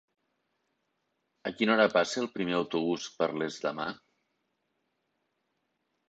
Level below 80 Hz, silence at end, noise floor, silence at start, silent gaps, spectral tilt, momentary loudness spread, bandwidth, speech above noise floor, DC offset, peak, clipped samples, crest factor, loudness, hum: -74 dBFS; 2.15 s; -79 dBFS; 1.45 s; none; -4.5 dB/octave; 14 LU; 8.4 kHz; 50 dB; under 0.1%; -10 dBFS; under 0.1%; 22 dB; -30 LUFS; none